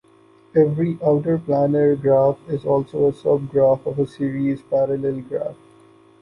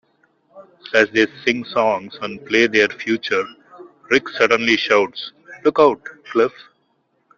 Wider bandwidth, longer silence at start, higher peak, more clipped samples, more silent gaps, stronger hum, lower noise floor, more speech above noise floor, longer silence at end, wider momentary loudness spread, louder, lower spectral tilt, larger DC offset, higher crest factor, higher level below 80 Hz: first, 9.8 kHz vs 7.4 kHz; about the same, 0.55 s vs 0.55 s; second, -4 dBFS vs 0 dBFS; neither; neither; neither; second, -52 dBFS vs -65 dBFS; second, 33 dB vs 47 dB; second, 0.7 s vs 0.9 s; second, 8 LU vs 12 LU; about the same, -20 LUFS vs -18 LUFS; first, -10.5 dB/octave vs -4 dB/octave; neither; about the same, 16 dB vs 20 dB; about the same, -56 dBFS vs -60 dBFS